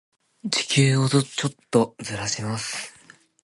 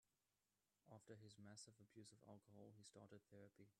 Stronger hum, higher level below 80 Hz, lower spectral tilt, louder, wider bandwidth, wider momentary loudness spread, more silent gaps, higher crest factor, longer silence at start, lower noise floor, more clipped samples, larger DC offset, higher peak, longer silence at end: neither; first, -60 dBFS vs under -90 dBFS; about the same, -4.5 dB/octave vs -4.5 dB/octave; first, -23 LUFS vs -66 LUFS; about the same, 11.5 kHz vs 11.5 kHz; first, 12 LU vs 5 LU; neither; about the same, 22 dB vs 20 dB; first, 0.45 s vs 0.05 s; second, -53 dBFS vs under -90 dBFS; neither; neither; first, -2 dBFS vs -48 dBFS; first, 0.55 s vs 0.05 s